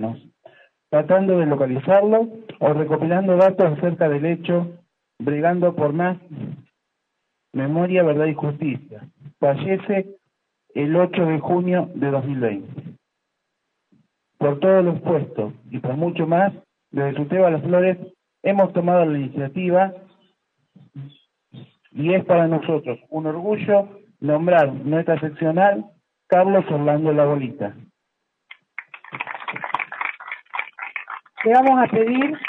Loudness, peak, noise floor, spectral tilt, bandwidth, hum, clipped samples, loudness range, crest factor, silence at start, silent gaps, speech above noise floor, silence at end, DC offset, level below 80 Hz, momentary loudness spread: -20 LUFS; -4 dBFS; -77 dBFS; -10 dB/octave; 4.1 kHz; none; under 0.1%; 6 LU; 16 dB; 0 s; none; 58 dB; 0 s; under 0.1%; -70 dBFS; 15 LU